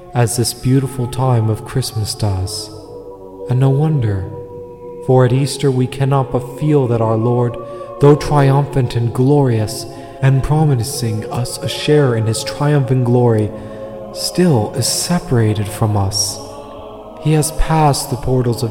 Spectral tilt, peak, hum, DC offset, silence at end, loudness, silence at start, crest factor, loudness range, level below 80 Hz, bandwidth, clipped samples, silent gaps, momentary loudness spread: -6 dB/octave; 0 dBFS; none; 0.1%; 0 s; -15 LUFS; 0 s; 14 dB; 4 LU; -34 dBFS; 17 kHz; under 0.1%; none; 16 LU